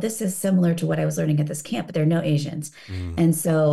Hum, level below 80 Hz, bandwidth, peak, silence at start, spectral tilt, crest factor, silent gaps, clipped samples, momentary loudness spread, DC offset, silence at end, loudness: none; -50 dBFS; 12.5 kHz; -10 dBFS; 0 s; -6.5 dB/octave; 12 dB; none; under 0.1%; 11 LU; 0.2%; 0 s; -22 LUFS